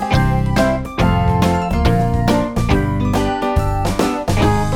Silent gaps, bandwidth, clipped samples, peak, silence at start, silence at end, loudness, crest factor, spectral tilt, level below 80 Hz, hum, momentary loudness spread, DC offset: none; 17.5 kHz; under 0.1%; -2 dBFS; 0 s; 0 s; -17 LUFS; 14 dB; -6.5 dB/octave; -24 dBFS; none; 3 LU; under 0.1%